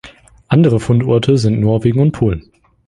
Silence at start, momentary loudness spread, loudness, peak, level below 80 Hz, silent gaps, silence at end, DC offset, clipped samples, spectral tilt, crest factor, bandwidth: 0.05 s; 6 LU; -14 LUFS; -2 dBFS; -36 dBFS; none; 0.5 s; under 0.1%; under 0.1%; -8 dB/octave; 12 dB; 11 kHz